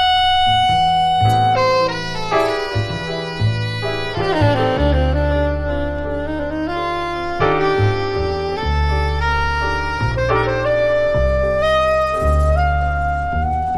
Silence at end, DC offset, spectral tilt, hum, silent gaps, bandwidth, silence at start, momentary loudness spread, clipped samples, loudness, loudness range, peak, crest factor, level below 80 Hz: 0 s; under 0.1%; -6 dB/octave; none; none; 12 kHz; 0 s; 7 LU; under 0.1%; -18 LUFS; 3 LU; -4 dBFS; 14 dB; -24 dBFS